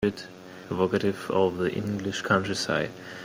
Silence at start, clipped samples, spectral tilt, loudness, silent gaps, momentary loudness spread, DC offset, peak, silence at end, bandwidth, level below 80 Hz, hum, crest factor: 0 s; under 0.1%; -5 dB/octave; -27 LUFS; none; 11 LU; under 0.1%; -8 dBFS; 0 s; 16 kHz; -58 dBFS; none; 20 dB